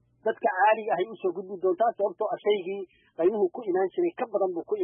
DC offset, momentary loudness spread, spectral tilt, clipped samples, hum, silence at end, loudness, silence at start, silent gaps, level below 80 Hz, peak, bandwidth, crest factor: under 0.1%; 9 LU; -9.5 dB/octave; under 0.1%; none; 0 s; -27 LUFS; 0.25 s; none; -78 dBFS; -12 dBFS; 3.6 kHz; 16 dB